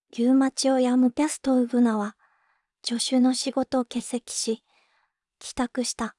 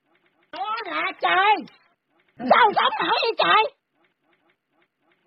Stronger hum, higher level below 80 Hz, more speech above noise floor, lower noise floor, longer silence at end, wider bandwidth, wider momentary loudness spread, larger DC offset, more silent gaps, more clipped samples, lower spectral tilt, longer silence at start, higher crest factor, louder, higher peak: neither; first, -60 dBFS vs -70 dBFS; about the same, 48 dB vs 49 dB; about the same, -71 dBFS vs -69 dBFS; second, 0.1 s vs 1.6 s; first, 12 kHz vs 5.8 kHz; second, 10 LU vs 13 LU; neither; neither; neither; second, -3.5 dB/octave vs -6 dB/octave; second, 0.15 s vs 0.55 s; second, 14 dB vs 20 dB; second, -24 LUFS vs -20 LUFS; second, -12 dBFS vs -4 dBFS